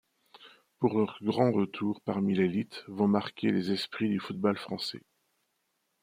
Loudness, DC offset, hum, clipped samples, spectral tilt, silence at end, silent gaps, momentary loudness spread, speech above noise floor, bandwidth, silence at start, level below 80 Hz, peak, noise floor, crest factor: -30 LUFS; under 0.1%; none; under 0.1%; -7 dB/octave; 1.05 s; none; 8 LU; 49 dB; 15 kHz; 0.4 s; -74 dBFS; -10 dBFS; -78 dBFS; 20 dB